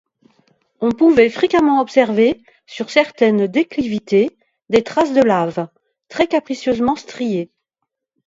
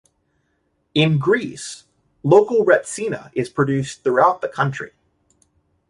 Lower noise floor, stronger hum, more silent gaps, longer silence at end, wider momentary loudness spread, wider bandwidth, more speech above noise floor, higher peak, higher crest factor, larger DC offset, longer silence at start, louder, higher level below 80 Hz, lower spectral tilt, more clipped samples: first, -78 dBFS vs -68 dBFS; neither; neither; second, 0.8 s vs 1.05 s; second, 12 LU vs 17 LU; second, 7.8 kHz vs 11.5 kHz; first, 62 dB vs 50 dB; about the same, 0 dBFS vs -2 dBFS; about the same, 16 dB vs 18 dB; neither; second, 0.8 s vs 0.95 s; first, -16 LUFS vs -19 LUFS; first, -54 dBFS vs -60 dBFS; about the same, -6 dB/octave vs -5.5 dB/octave; neither